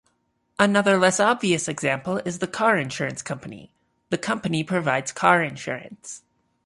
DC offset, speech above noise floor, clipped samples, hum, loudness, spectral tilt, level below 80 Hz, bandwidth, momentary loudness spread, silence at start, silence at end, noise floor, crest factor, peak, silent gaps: under 0.1%; 47 dB; under 0.1%; none; -22 LUFS; -4 dB/octave; -62 dBFS; 11.5 kHz; 17 LU; 0.6 s; 0.5 s; -70 dBFS; 20 dB; -2 dBFS; none